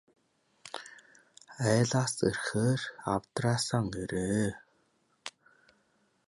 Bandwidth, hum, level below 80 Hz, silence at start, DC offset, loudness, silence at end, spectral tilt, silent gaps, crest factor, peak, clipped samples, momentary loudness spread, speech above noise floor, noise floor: 11.5 kHz; none; -60 dBFS; 0.65 s; under 0.1%; -31 LUFS; 1 s; -5 dB/octave; none; 20 dB; -12 dBFS; under 0.1%; 18 LU; 42 dB; -72 dBFS